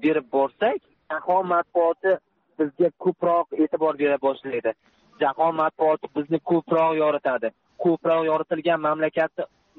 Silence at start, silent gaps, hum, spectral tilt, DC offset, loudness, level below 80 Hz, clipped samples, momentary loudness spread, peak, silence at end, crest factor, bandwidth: 0 s; none; none; -4.5 dB/octave; under 0.1%; -23 LUFS; -70 dBFS; under 0.1%; 7 LU; -10 dBFS; 0.35 s; 14 dB; 4.5 kHz